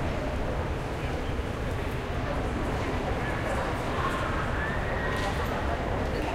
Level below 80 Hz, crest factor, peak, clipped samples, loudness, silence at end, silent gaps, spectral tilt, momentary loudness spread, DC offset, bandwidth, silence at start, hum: -34 dBFS; 12 dB; -16 dBFS; under 0.1%; -30 LUFS; 0 s; none; -6 dB/octave; 3 LU; under 0.1%; 16 kHz; 0 s; none